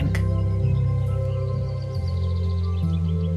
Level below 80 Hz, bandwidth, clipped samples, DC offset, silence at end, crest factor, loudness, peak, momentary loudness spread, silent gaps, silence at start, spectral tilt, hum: -32 dBFS; 6.6 kHz; under 0.1%; under 0.1%; 0 s; 12 dB; -24 LUFS; -10 dBFS; 5 LU; none; 0 s; -9 dB/octave; none